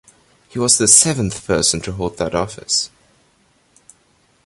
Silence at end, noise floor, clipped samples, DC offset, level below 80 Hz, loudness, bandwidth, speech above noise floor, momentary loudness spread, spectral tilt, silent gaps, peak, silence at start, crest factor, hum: 1.6 s; -58 dBFS; under 0.1%; under 0.1%; -44 dBFS; -15 LUFS; 16 kHz; 41 dB; 14 LU; -2.5 dB/octave; none; 0 dBFS; 0.55 s; 20 dB; none